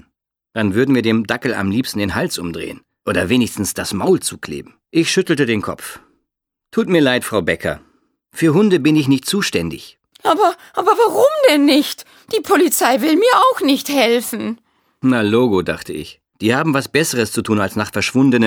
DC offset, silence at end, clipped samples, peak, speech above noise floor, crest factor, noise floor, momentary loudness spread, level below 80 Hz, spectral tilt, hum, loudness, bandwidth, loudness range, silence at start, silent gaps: under 0.1%; 0 s; under 0.1%; 0 dBFS; 63 dB; 16 dB; -79 dBFS; 14 LU; -52 dBFS; -4.5 dB/octave; none; -16 LUFS; over 20 kHz; 5 LU; 0.55 s; none